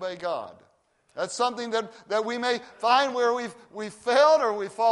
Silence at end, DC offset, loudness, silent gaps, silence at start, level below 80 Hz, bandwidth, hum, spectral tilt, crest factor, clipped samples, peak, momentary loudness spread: 0 s; under 0.1%; -25 LUFS; none; 0 s; -76 dBFS; 11.5 kHz; none; -2.5 dB/octave; 18 dB; under 0.1%; -8 dBFS; 16 LU